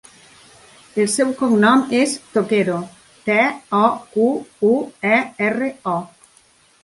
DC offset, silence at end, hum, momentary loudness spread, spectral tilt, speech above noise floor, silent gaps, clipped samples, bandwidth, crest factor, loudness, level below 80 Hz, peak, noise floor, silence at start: under 0.1%; 0.75 s; none; 9 LU; -4.5 dB/octave; 36 dB; none; under 0.1%; 11.5 kHz; 18 dB; -18 LUFS; -64 dBFS; -2 dBFS; -54 dBFS; 0.95 s